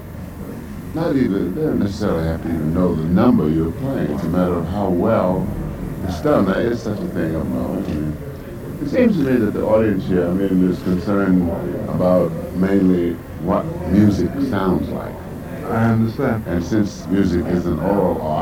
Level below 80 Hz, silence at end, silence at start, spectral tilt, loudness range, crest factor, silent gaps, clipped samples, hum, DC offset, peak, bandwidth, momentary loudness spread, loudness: -36 dBFS; 0 s; 0 s; -8.5 dB/octave; 3 LU; 16 dB; none; under 0.1%; none; under 0.1%; -2 dBFS; 16.5 kHz; 11 LU; -19 LUFS